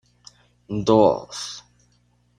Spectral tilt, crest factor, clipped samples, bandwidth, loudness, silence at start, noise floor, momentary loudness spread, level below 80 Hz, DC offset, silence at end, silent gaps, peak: -6 dB/octave; 22 dB; under 0.1%; 10.5 kHz; -21 LUFS; 0.7 s; -62 dBFS; 17 LU; -54 dBFS; under 0.1%; 0.8 s; none; -2 dBFS